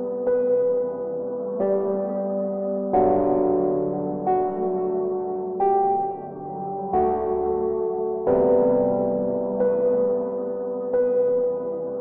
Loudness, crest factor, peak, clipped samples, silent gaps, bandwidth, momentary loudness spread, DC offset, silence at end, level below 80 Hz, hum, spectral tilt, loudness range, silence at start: -23 LUFS; 14 dB; -8 dBFS; under 0.1%; none; 2.7 kHz; 8 LU; under 0.1%; 0 s; -54 dBFS; none; -13.5 dB/octave; 2 LU; 0 s